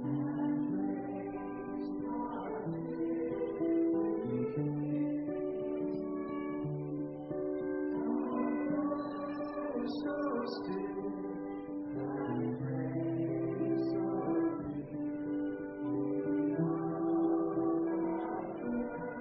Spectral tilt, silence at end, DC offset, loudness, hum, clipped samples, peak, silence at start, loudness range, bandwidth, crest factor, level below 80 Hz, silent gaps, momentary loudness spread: -8 dB/octave; 0 s; under 0.1%; -36 LUFS; none; under 0.1%; -22 dBFS; 0 s; 3 LU; 5.4 kHz; 14 dB; -66 dBFS; none; 7 LU